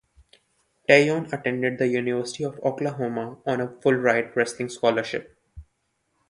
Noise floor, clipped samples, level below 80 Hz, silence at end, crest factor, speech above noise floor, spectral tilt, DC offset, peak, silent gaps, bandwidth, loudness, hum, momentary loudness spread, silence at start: -73 dBFS; under 0.1%; -58 dBFS; 0.7 s; 24 dB; 50 dB; -5.5 dB/octave; under 0.1%; -2 dBFS; none; 11.5 kHz; -24 LUFS; none; 12 LU; 0.9 s